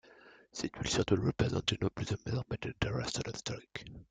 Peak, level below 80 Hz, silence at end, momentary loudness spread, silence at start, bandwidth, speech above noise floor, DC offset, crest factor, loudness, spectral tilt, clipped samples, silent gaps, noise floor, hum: -14 dBFS; -54 dBFS; 0.05 s; 12 LU; 0.25 s; 9.4 kHz; 24 dB; under 0.1%; 22 dB; -35 LUFS; -5 dB/octave; under 0.1%; none; -59 dBFS; none